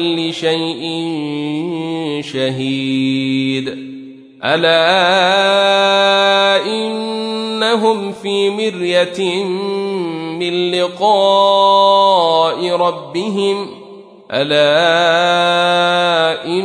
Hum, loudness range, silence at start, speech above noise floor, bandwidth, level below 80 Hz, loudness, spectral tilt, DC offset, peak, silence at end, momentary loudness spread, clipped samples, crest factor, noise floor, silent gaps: none; 6 LU; 0 s; 23 dB; 10.5 kHz; -66 dBFS; -14 LUFS; -4.5 dB/octave; under 0.1%; 0 dBFS; 0 s; 10 LU; under 0.1%; 14 dB; -37 dBFS; none